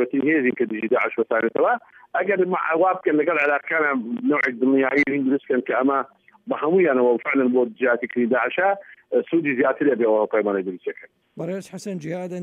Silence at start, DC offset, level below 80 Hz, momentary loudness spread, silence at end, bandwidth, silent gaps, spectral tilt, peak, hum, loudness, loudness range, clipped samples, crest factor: 0 s; under 0.1%; -76 dBFS; 11 LU; 0 s; 10.5 kHz; none; -7 dB/octave; -8 dBFS; none; -21 LUFS; 2 LU; under 0.1%; 14 dB